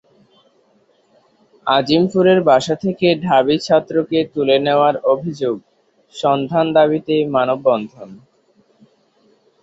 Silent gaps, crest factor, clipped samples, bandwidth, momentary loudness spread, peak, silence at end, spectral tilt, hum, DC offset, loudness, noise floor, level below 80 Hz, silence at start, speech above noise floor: none; 16 dB; under 0.1%; 8 kHz; 8 LU; -2 dBFS; 1.45 s; -6 dB/octave; none; under 0.1%; -16 LUFS; -57 dBFS; -60 dBFS; 1.65 s; 42 dB